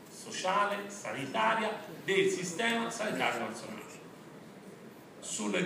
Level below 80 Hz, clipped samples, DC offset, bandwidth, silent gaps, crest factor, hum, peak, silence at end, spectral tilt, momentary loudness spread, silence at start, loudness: -80 dBFS; under 0.1%; under 0.1%; 15.5 kHz; none; 20 dB; none; -14 dBFS; 0 s; -3 dB/octave; 21 LU; 0 s; -33 LUFS